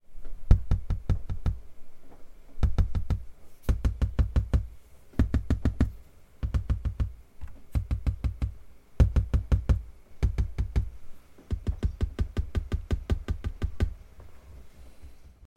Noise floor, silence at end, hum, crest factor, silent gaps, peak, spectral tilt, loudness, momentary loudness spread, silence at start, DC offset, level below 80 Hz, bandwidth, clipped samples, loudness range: -48 dBFS; 0.3 s; none; 24 dB; none; -4 dBFS; -8 dB/octave; -31 LUFS; 11 LU; 0.1 s; under 0.1%; -30 dBFS; 8.6 kHz; under 0.1%; 4 LU